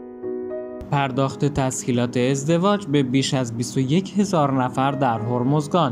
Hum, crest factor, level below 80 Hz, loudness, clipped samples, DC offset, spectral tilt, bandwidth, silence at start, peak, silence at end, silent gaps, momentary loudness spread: none; 16 dB; -52 dBFS; -21 LUFS; under 0.1%; under 0.1%; -6 dB/octave; 14.5 kHz; 0 s; -6 dBFS; 0 s; none; 8 LU